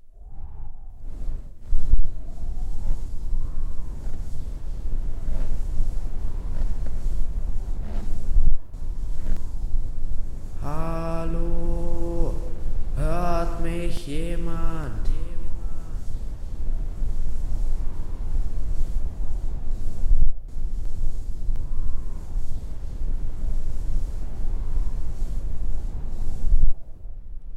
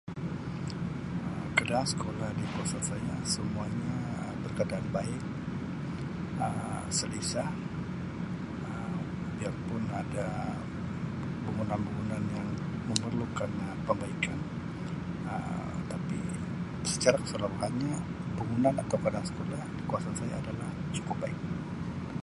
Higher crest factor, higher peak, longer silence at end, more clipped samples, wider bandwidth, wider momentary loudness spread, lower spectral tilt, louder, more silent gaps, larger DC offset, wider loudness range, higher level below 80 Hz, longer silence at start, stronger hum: second, 12 dB vs 30 dB; about the same, -6 dBFS vs -4 dBFS; about the same, 0 s vs 0 s; neither; second, 2.9 kHz vs 11.5 kHz; about the same, 9 LU vs 7 LU; first, -7.5 dB/octave vs -5 dB/octave; about the same, -32 LUFS vs -34 LUFS; neither; neither; about the same, 5 LU vs 4 LU; first, -22 dBFS vs -52 dBFS; about the same, 0.05 s vs 0.05 s; neither